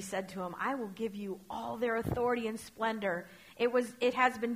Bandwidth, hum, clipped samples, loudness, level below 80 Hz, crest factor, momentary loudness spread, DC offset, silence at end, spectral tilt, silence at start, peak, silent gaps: 15.5 kHz; none; under 0.1%; -34 LUFS; -62 dBFS; 20 dB; 11 LU; under 0.1%; 0 s; -5 dB/octave; 0 s; -14 dBFS; none